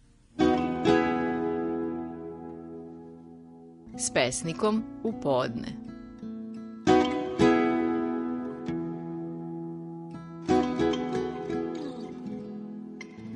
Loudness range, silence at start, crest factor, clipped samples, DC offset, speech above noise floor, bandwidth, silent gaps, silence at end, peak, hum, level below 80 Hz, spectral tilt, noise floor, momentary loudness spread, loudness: 4 LU; 0.35 s; 22 dB; under 0.1%; under 0.1%; 20 dB; 10.5 kHz; none; 0 s; -8 dBFS; none; -54 dBFS; -5 dB/octave; -49 dBFS; 18 LU; -29 LUFS